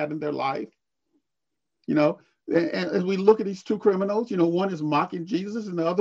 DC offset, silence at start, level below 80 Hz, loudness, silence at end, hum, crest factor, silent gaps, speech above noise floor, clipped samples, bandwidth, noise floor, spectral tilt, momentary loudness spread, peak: under 0.1%; 0 s; -72 dBFS; -25 LUFS; 0 s; none; 20 dB; none; 62 dB; under 0.1%; 7.6 kHz; -86 dBFS; -7.5 dB/octave; 8 LU; -4 dBFS